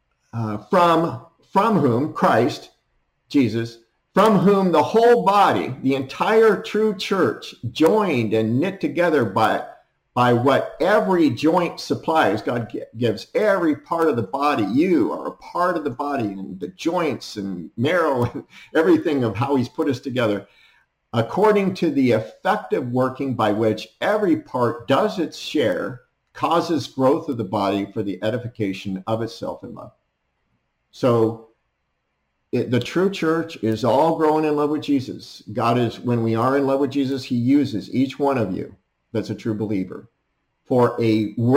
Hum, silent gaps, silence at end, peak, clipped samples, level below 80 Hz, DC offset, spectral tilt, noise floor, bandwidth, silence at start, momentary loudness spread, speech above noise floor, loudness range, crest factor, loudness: none; none; 0 s; -6 dBFS; under 0.1%; -60 dBFS; under 0.1%; -7 dB/octave; -73 dBFS; 16 kHz; 0.35 s; 11 LU; 53 dB; 6 LU; 16 dB; -20 LUFS